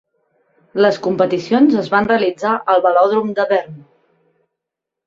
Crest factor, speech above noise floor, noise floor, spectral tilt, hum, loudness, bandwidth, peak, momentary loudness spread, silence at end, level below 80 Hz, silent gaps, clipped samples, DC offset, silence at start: 16 dB; 67 dB; -82 dBFS; -6.5 dB/octave; none; -15 LUFS; 7.6 kHz; -2 dBFS; 6 LU; 1.3 s; -58 dBFS; none; under 0.1%; under 0.1%; 0.75 s